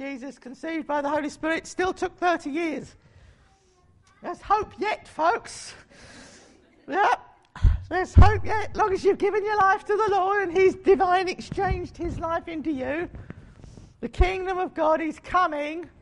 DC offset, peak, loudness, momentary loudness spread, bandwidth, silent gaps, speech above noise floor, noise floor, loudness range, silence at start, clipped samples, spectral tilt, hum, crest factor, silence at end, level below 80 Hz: under 0.1%; -4 dBFS; -24 LUFS; 16 LU; 11 kHz; none; 36 dB; -60 dBFS; 8 LU; 0 s; under 0.1%; -6.5 dB/octave; none; 20 dB; 0.15 s; -32 dBFS